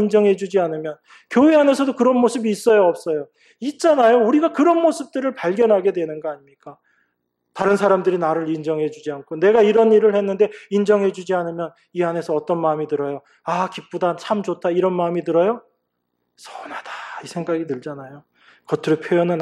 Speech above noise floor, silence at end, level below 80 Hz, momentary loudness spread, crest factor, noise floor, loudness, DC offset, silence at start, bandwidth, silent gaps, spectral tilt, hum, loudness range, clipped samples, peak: 55 dB; 0 s; -70 dBFS; 16 LU; 16 dB; -74 dBFS; -19 LUFS; under 0.1%; 0 s; 12.5 kHz; none; -6.5 dB/octave; none; 7 LU; under 0.1%; -4 dBFS